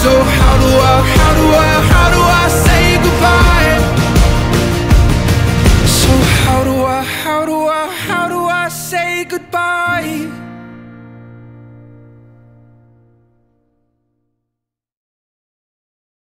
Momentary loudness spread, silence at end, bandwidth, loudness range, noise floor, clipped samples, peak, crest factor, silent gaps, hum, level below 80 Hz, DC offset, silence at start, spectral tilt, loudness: 8 LU; 4.9 s; 16.5 kHz; 12 LU; -78 dBFS; under 0.1%; 0 dBFS; 12 dB; none; none; -18 dBFS; under 0.1%; 0 s; -5 dB/octave; -11 LUFS